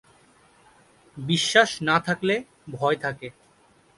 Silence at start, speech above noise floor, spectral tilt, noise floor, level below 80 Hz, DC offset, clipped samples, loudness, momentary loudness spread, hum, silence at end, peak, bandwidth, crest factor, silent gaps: 1.15 s; 35 dB; -4 dB/octave; -59 dBFS; -64 dBFS; under 0.1%; under 0.1%; -23 LUFS; 19 LU; none; 0.65 s; -2 dBFS; 11.5 kHz; 24 dB; none